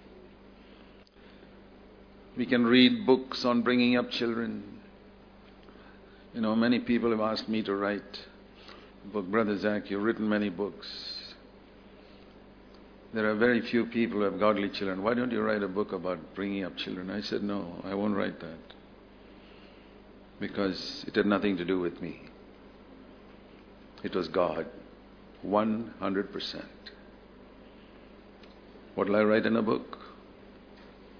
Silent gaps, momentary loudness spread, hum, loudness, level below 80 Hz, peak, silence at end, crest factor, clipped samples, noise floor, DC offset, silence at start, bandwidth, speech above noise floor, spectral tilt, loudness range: none; 21 LU; none; -29 LUFS; -60 dBFS; -8 dBFS; 0 s; 22 dB; under 0.1%; -54 dBFS; under 0.1%; 0.05 s; 5.4 kHz; 25 dB; -6.5 dB/octave; 9 LU